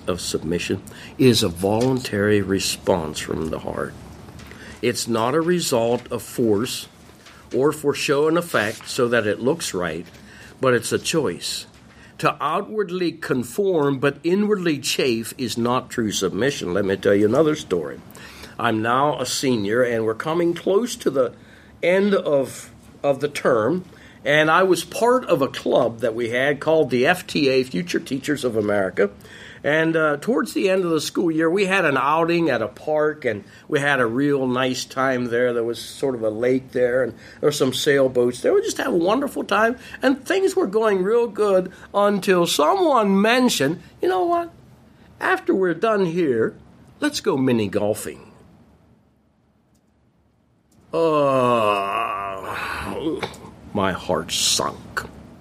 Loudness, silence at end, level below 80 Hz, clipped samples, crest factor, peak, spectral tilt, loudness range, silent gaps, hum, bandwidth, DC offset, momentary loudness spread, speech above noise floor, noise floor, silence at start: -21 LUFS; 0.05 s; -54 dBFS; under 0.1%; 18 dB; -2 dBFS; -4.5 dB/octave; 4 LU; none; none; 15.5 kHz; under 0.1%; 9 LU; 40 dB; -61 dBFS; 0 s